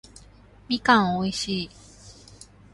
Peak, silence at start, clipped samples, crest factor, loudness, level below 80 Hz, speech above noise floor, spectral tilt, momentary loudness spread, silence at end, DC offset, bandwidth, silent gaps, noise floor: -4 dBFS; 0.7 s; under 0.1%; 22 dB; -23 LUFS; -54 dBFS; 28 dB; -4.5 dB/octave; 11 LU; 0.6 s; under 0.1%; 11.5 kHz; none; -51 dBFS